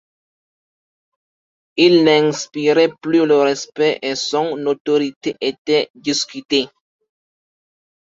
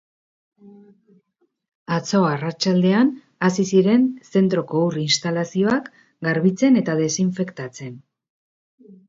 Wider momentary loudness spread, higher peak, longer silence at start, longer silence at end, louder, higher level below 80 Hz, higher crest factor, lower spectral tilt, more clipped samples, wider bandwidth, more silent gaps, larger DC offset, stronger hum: about the same, 9 LU vs 11 LU; about the same, -2 dBFS vs -4 dBFS; first, 1.75 s vs 0.65 s; first, 1.45 s vs 0.15 s; first, -17 LUFS vs -20 LUFS; about the same, -64 dBFS vs -66 dBFS; about the same, 18 dB vs 16 dB; second, -4 dB/octave vs -5.5 dB/octave; neither; about the same, 7.8 kHz vs 7.8 kHz; second, 4.80-4.85 s, 5.16-5.21 s, 5.58-5.65 s, 5.90-5.94 s vs 1.75-1.86 s, 8.30-8.78 s; neither; neither